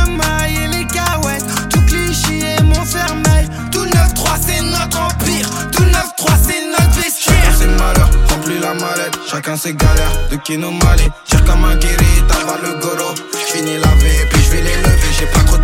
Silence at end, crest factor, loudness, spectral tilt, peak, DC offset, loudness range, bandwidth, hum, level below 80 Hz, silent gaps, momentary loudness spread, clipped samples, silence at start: 0 s; 12 dB; -14 LUFS; -4 dB/octave; 0 dBFS; under 0.1%; 2 LU; 17 kHz; none; -14 dBFS; none; 6 LU; under 0.1%; 0 s